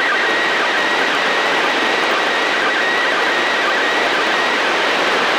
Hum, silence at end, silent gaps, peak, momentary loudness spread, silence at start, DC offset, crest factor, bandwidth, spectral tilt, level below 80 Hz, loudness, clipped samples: none; 0 s; none; -6 dBFS; 0 LU; 0 s; under 0.1%; 10 dB; over 20 kHz; -1.5 dB/octave; -58 dBFS; -15 LUFS; under 0.1%